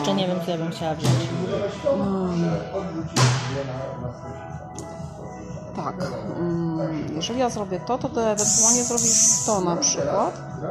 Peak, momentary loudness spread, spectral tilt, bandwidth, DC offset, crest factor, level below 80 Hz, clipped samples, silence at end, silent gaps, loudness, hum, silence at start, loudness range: -4 dBFS; 19 LU; -3.5 dB/octave; 14.5 kHz; under 0.1%; 20 dB; -50 dBFS; under 0.1%; 0 s; none; -22 LUFS; none; 0 s; 11 LU